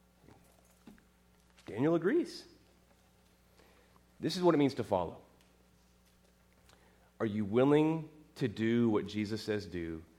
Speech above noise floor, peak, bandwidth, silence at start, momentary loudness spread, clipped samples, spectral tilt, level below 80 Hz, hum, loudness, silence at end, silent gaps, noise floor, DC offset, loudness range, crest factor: 35 dB; -16 dBFS; 14 kHz; 1.7 s; 15 LU; under 0.1%; -7 dB/octave; -68 dBFS; 60 Hz at -65 dBFS; -33 LUFS; 0.15 s; none; -66 dBFS; under 0.1%; 5 LU; 20 dB